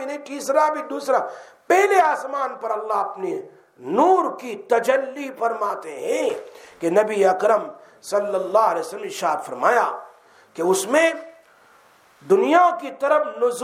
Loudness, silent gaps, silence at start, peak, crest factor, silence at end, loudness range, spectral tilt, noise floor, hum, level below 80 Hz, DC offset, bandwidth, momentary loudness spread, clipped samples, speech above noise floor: -21 LUFS; none; 0 s; -2 dBFS; 18 dB; 0 s; 2 LU; -3.5 dB/octave; -54 dBFS; none; -78 dBFS; under 0.1%; 16 kHz; 13 LU; under 0.1%; 33 dB